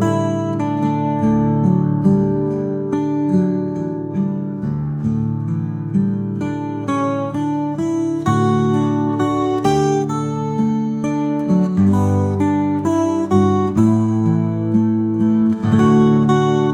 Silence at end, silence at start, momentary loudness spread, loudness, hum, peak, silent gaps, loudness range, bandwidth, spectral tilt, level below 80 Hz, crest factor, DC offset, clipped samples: 0 s; 0 s; 7 LU; -18 LUFS; none; -2 dBFS; none; 5 LU; 10 kHz; -8.5 dB/octave; -50 dBFS; 14 dB; 0.1%; under 0.1%